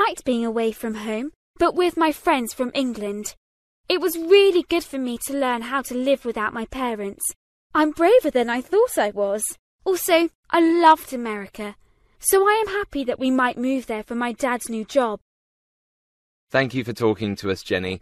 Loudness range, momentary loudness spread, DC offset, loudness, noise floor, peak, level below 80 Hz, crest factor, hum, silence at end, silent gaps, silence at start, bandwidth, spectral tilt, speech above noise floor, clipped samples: 5 LU; 12 LU; under 0.1%; -22 LUFS; under -90 dBFS; -4 dBFS; -54 dBFS; 18 dB; none; 0.05 s; 1.36-1.54 s, 3.37-3.84 s, 7.36-7.70 s, 9.59-9.79 s, 10.35-10.43 s, 15.21-16.47 s; 0 s; 14 kHz; -4 dB/octave; over 69 dB; under 0.1%